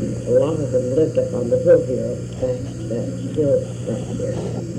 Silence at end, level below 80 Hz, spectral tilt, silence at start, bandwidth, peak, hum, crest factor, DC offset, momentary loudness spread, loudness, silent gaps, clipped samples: 0 s; -44 dBFS; -7.5 dB/octave; 0 s; 9.8 kHz; -4 dBFS; 60 Hz at -30 dBFS; 16 dB; under 0.1%; 10 LU; -20 LUFS; none; under 0.1%